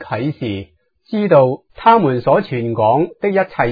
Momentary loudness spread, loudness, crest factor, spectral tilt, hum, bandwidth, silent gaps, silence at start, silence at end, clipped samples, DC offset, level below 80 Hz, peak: 12 LU; -15 LUFS; 16 dB; -10 dB/octave; none; 5 kHz; none; 0 s; 0 s; under 0.1%; under 0.1%; -52 dBFS; 0 dBFS